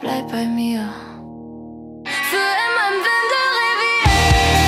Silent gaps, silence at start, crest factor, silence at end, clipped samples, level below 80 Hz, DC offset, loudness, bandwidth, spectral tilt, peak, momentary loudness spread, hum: none; 0 s; 16 dB; 0 s; under 0.1%; -28 dBFS; under 0.1%; -17 LUFS; 16 kHz; -4 dB/octave; -2 dBFS; 22 LU; none